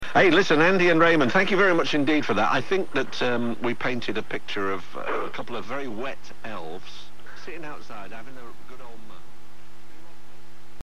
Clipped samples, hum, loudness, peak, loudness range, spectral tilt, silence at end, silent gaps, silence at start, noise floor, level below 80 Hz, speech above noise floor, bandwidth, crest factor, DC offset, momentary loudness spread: under 0.1%; none; -23 LUFS; -6 dBFS; 22 LU; -5 dB/octave; 1.65 s; none; 0 s; -52 dBFS; -58 dBFS; 28 dB; 13.5 kHz; 18 dB; 5%; 22 LU